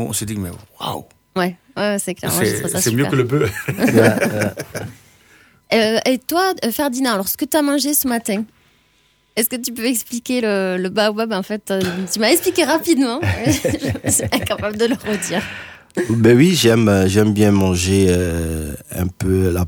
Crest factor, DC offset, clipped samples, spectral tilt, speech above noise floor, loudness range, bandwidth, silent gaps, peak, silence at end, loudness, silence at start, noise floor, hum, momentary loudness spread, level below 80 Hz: 18 dB; under 0.1%; under 0.1%; -4.5 dB/octave; 41 dB; 5 LU; over 20 kHz; none; 0 dBFS; 0 s; -17 LUFS; 0 s; -58 dBFS; none; 12 LU; -42 dBFS